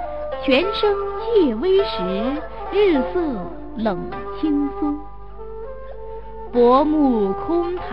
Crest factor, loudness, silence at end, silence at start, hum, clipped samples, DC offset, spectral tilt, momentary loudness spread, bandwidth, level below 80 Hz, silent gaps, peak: 16 dB; -20 LUFS; 0 s; 0 s; none; under 0.1%; 2%; -8 dB/octave; 18 LU; 5.6 kHz; -40 dBFS; none; -4 dBFS